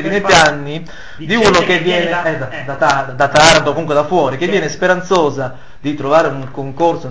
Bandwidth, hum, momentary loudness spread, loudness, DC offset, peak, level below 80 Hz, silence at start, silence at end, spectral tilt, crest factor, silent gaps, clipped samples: 8 kHz; none; 16 LU; -13 LUFS; 3%; 0 dBFS; -40 dBFS; 0 s; 0 s; -4 dB/octave; 14 dB; none; 0.2%